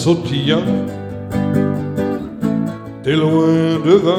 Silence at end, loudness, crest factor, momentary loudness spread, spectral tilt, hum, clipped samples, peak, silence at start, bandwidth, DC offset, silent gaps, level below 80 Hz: 0 s; -17 LUFS; 16 dB; 10 LU; -7 dB/octave; none; under 0.1%; 0 dBFS; 0 s; 13.5 kHz; under 0.1%; none; -46 dBFS